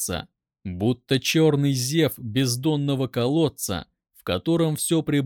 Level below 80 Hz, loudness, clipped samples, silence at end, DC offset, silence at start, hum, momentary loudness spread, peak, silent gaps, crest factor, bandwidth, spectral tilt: -54 dBFS; -23 LUFS; under 0.1%; 0 s; under 0.1%; 0 s; none; 11 LU; -8 dBFS; none; 16 dB; 19.5 kHz; -5 dB/octave